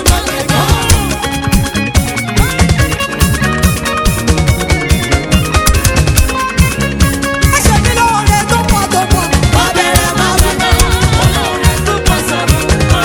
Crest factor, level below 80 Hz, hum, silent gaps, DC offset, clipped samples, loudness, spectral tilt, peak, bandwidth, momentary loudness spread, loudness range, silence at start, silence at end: 10 dB; -18 dBFS; none; none; under 0.1%; 0.9%; -11 LUFS; -4 dB/octave; 0 dBFS; over 20 kHz; 3 LU; 2 LU; 0 s; 0 s